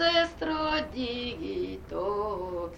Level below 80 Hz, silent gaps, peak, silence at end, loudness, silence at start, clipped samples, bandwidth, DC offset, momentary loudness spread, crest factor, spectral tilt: -48 dBFS; none; -12 dBFS; 0 s; -31 LUFS; 0 s; under 0.1%; 9.8 kHz; under 0.1%; 8 LU; 18 dB; -5 dB/octave